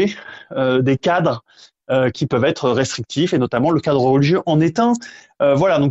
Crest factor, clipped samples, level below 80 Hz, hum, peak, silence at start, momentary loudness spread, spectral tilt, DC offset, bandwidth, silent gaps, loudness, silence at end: 14 dB; under 0.1%; -52 dBFS; none; -2 dBFS; 0 s; 7 LU; -6.5 dB/octave; under 0.1%; 8.2 kHz; none; -17 LUFS; 0 s